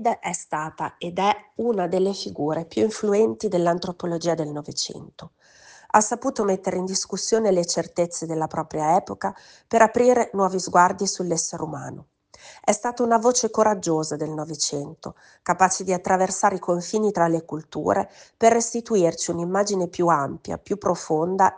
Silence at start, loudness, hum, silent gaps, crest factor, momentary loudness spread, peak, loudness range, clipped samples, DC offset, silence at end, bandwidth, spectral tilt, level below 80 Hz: 0 s; -23 LUFS; none; none; 22 dB; 11 LU; -2 dBFS; 3 LU; under 0.1%; under 0.1%; 0 s; 10.5 kHz; -4 dB/octave; -62 dBFS